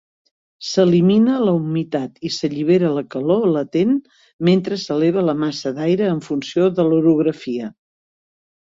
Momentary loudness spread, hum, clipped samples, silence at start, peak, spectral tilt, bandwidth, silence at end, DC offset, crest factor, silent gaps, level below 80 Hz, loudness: 9 LU; none; under 0.1%; 0.6 s; -2 dBFS; -7 dB/octave; 7.8 kHz; 0.95 s; under 0.1%; 16 dB; 4.33-4.39 s; -60 dBFS; -18 LUFS